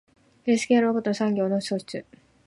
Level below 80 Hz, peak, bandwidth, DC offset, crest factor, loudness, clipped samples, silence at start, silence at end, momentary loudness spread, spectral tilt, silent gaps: -68 dBFS; -8 dBFS; 11.5 kHz; under 0.1%; 16 dB; -24 LUFS; under 0.1%; 0.45 s; 0.45 s; 13 LU; -5.5 dB/octave; none